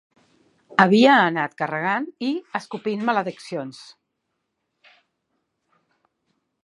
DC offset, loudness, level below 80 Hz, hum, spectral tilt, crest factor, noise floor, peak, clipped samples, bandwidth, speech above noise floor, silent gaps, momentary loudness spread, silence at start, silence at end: under 0.1%; -21 LUFS; -74 dBFS; none; -6 dB/octave; 22 dB; -77 dBFS; 0 dBFS; under 0.1%; 11 kHz; 56 dB; none; 17 LU; 0.7 s; 2.8 s